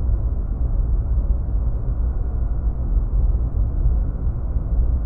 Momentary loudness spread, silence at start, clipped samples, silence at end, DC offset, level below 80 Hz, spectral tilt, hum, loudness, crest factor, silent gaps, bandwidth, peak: 3 LU; 0 s; under 0.1%; 0 s; under 0.1%; -20 dBFS; -13.5 dB/octave; none; -24 LUFS; 12 dB; none; 1.6 kHz; -8 dBFS